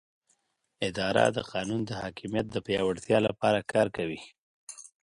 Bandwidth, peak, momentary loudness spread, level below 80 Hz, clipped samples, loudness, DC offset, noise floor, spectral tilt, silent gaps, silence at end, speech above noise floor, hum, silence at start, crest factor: 11.5 kHz; -8 dBFS; 12 LU; -58 dBFS; under 0.1%; -29 LUFS; under 0.1%; -74 dBFS; -5 dB/octave; 4.39-4.67 s; 0.15 s; 45 dB; none; 0.8 s; 22 dB